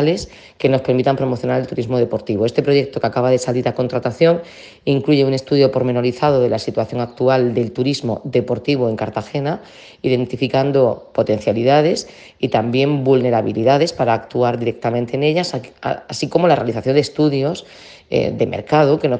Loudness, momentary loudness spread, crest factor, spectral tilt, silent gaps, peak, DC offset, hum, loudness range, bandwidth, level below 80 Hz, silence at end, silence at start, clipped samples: -17 LUFS; 8 LU; 16 dB; -6.5 dB/octave; none; 0 dBFS; under 0.1%; none; 3 LU; 9.6 kHz; -54 dBFS; 0 s; 0 s; under 0.1%